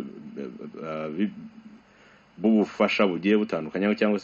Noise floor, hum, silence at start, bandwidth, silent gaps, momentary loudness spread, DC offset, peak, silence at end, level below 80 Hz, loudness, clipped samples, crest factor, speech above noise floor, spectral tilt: -55 dBFS; none; 0 s; 7.2 kHz; none; 16 LU; under 0.1%; -8 dBFS; 0 s; -68 dBFS; -25 LUFS; under 0.1%; 20 dB; 31 dB; -5 dB/octave